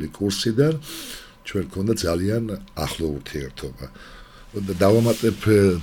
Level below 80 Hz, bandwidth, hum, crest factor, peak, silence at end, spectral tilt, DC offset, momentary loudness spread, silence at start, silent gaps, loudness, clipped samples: -44 dBFS; 19 kHz; none; 16 dB; -6 dBFS; 0 s; -6 dB/octave; under 0.1%; 18 LU; 0 s; none; -22 LUFS; under 0.1%